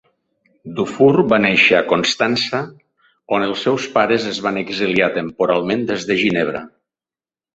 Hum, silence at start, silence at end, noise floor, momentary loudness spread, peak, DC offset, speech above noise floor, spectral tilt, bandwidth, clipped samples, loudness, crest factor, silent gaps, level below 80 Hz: none; 0.65 s; 0.85 s; under -90 dBFS; 11 LU; -2 dBFS; under 0.1%; over 73 dB; -5 dB/octave; 8.2 kHz; under 0.1%; -17 LUFS; 16 dB; none; -56 dBFS